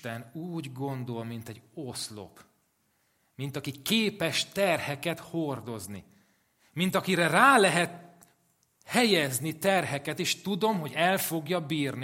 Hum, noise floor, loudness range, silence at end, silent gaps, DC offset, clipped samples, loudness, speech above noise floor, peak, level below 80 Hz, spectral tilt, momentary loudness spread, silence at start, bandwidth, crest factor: none; -72 dBFS; 13 LU; 0 s; none; under 0.1%; under 0.1%; -28 LUFS; 44 dB; -4 dBFS; -72 dBFS; -4 dB/octave; 16 LU; 0.05 s; 16.5 kHz; 24 dB